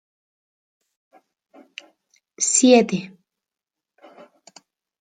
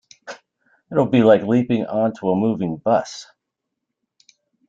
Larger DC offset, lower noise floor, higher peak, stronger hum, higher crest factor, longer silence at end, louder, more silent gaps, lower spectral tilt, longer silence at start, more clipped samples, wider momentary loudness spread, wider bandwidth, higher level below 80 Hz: neither; first, -88 dBFS vs -80 dBFS; about the same, -2 dBFS vs -2 dBFS; neither; about the same, 22 dB vs 18 dB; first, 1.95 s vs 1.45 s; about the same, -17 LUFS vs -19 LUFS; neither; second, -3 dB/octave vs -7 dB/octave; first, 2.4 s vs 0.25 s; neither; first, 28 LU vs 23 LU; first, 9.6 kHz vs 7.8 kHz; second, -74 dBFS vs -62 dBFS